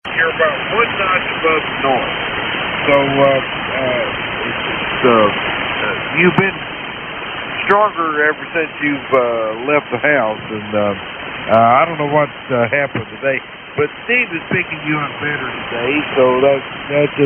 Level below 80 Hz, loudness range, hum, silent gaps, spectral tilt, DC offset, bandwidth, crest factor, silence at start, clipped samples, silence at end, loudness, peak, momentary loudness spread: -46 dBFS; 2 LU; none; none; -0.5 dB/octave; under 0.1%; 3.9 kHz; 16 dB; 0.05 s; under 0.1%; 0 s; -16 LUFS; 0 dBFS; 8 LU